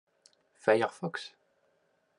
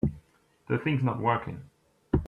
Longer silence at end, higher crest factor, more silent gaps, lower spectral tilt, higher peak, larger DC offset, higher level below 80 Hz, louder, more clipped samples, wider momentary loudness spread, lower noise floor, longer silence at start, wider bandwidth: first, 0.9 s vs 0 s; first, 26 dB vs 18 dB; neither; second, -5.5 dB/octave vs -9 dB/octave; first, -8 dBFS vs -12 dBFS; neither; second, -86 dBFS vs -44 dBFS; about the same, -31 LUFS vs -29 LUFS; neither; first, 15 LU vs 12 LU; first, -73 dBFS vs -63 dBFS; first, 0.65 s vs 0.05 s; first, 11 kHz vs 4.2 kHz